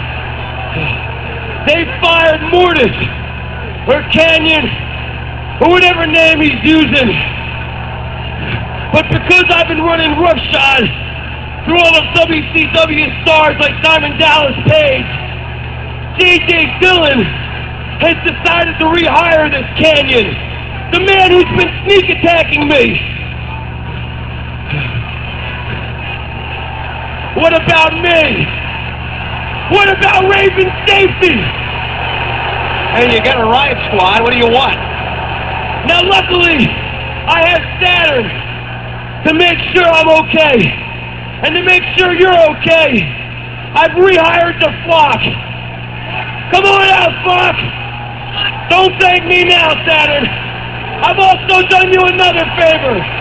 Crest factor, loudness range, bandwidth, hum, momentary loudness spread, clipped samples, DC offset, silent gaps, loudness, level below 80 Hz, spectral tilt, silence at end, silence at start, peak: 10 dB; 3 LU; 8 kHz; 60 Hz at -25 dBFS; 14 LU; 0.5%; 0.6%; none; -9 LUFS; -28 dBFS; -5.5 dB/octave; 0 s; 0 s; 0 dBFS